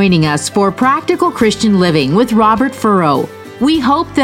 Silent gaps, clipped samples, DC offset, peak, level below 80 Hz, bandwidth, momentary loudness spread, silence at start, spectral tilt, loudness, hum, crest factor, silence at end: none; under 0.1%; under 0.1%; 0 dBFS; -42 dBFS; 16 kHz; 4 LU; 0 s; -5.5 dB/octave; -12 LUFS; none; 12 dB; 0 s